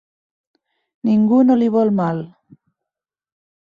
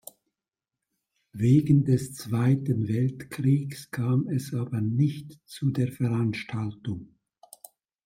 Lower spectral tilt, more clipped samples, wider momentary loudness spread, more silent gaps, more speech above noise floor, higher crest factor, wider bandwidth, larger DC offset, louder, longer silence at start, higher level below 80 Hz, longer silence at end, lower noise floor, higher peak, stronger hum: first, -10 dB/octave vs -7.5 dB/octave; neither; about the same, 13 LU vs 13 LU; neither; first, 72 dB vs 64 dB; about the same, 16 dB vs 18 dB; second, 5 kHz vs 16 kHz; neither; first, -16 LUFS vs -26 LUFS; second, 1.05 s vs 1.35 s; about the same, -64 dBFS vs -62 dBFS; first, 1.4 s vs 1 s; about the same, -87 dBFS vs -90 dBFS; first, -4 dBFS vs -10 dBFS; neither